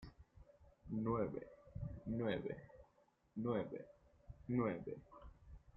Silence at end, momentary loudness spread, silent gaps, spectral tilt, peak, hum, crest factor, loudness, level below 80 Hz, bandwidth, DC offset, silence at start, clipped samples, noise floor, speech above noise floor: 0.2 s; 22 LU; none; -7 dB/octave; -26 dBFS; none; 20 dB; -44 LUFS; -64 dBFS; 5.6 kHz; under 0.1%; 0 s; under 0.1%; -76 dBFS; 34 dB